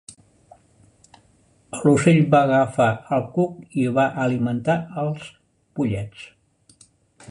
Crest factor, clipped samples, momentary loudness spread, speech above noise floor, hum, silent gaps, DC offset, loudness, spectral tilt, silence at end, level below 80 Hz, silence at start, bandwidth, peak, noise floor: 20 dB; under 0.1%; 19 LU; 39 dB; none; none; under 0.1%; -21 LUFS; -7 dB/octave; 1.05 s; -56 dBFS; 1.75 s; 11 kHz; -2 dBFS; -58 dBFS